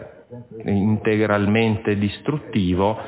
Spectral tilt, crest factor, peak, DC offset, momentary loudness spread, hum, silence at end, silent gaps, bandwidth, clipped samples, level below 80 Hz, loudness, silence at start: -11.5 dB/octave; 16 dB; -4 dBFS; under 0.1%; 16 LU; none; 0 s; none; 4 kHz; under 0.1%; -42 dBFS; -20 LUFS; 0 s